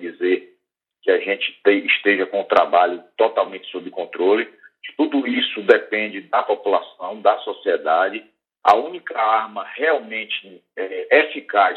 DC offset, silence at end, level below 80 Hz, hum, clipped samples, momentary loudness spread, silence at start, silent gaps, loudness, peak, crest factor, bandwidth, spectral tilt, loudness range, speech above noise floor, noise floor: under 0.1%; 0 s; -76 dBFS; none; under 0.1%; 13 LU; 0 s; none; -19 LUFS; 0 dBFS; 20 dB; 7.8 kHz; -5 dB/octave; 2 LU; 51 dB; -70 dBFS